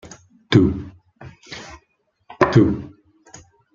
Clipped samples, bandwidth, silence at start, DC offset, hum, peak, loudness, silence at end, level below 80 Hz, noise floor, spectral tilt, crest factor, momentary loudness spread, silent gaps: under 0.1%; 7.4 kHz; 0.5 s; under 0.1%; none; -2 dBFS; -18 LUFS; 0.85 s; -44 dBFS; -66 dBFS; -7 dB/octave; 20 dB; 25 LU; none